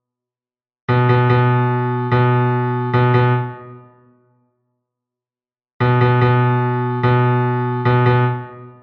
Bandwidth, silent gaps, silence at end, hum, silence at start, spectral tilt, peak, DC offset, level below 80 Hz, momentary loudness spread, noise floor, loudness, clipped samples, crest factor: 4.4 kHz; 5.73-5.80 s; 0.1 s; none; 0.9 s; -10 dB/octave; -4 dBFS; under 0.1%; -50 dBFS; 7 LU; under -90 dBFS; -16 LUFS; under 0.1%; 14 dB